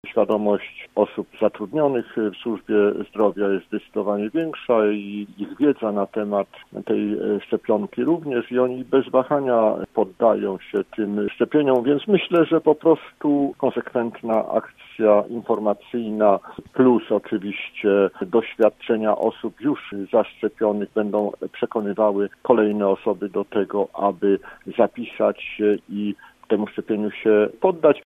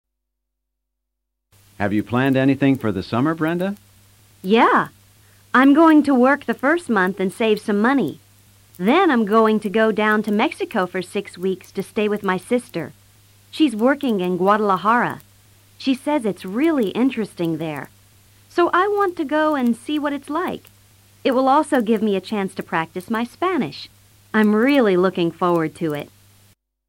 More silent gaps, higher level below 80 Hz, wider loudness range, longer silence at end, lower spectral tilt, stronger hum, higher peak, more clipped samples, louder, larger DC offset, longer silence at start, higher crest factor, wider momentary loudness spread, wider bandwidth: neither; about the same, -64 dBFS vs -62 dBFS; about the same, 3 LU vs 5 LU; second, 0.05 s vs 0.8 s; first, -8.5 dB/octave vs -6.5 dB/octave; neither; first, 0 dBFS vs -4 dBFS; neither; second, -22 LUFS vs -19 LUFS; neither; second, 0.05 s vs 1.8 s; about the same, 20 dB vs 16 dB; second, 8 LU vs 11 LU; second, 3.9 kHz vs 16.5 kHz